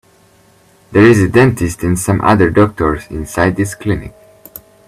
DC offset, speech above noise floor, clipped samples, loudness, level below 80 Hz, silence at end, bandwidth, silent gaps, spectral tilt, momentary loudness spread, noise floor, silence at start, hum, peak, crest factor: under 0.1%; 37 dB; under 0.1%; -13 LUFS; -36 dBFS; 0.8 s; 15 kHz; none; -6.5 dB/octave; 11 LU; -48 dBFS; 0.9 s; none; 0 dBFS; 14 dB